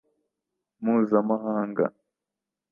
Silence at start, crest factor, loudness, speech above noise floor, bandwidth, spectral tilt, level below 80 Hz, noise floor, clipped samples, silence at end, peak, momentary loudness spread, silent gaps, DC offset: 0.8 s; 20 dB; -26 LUFS; 64 dB; 2.8 kHz; -11.5 dB/octave; -78 dBFS; -88 dBFS; under 0.1%; 0.8 s; -8 dBFS; 7 LU; none; under 0.1%